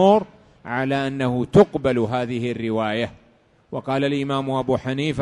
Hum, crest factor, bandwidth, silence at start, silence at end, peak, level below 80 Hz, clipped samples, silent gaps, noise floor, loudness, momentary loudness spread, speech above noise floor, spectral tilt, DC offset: none; 20 dB; 11.5 kHz; 0 s; 0 s; -2 dBFS; -50 dBFS; under 0.1%; none; -56 dBFS; -22 LUFS; 13 LU; 36 dB; -7 dB/octave; under 0.1%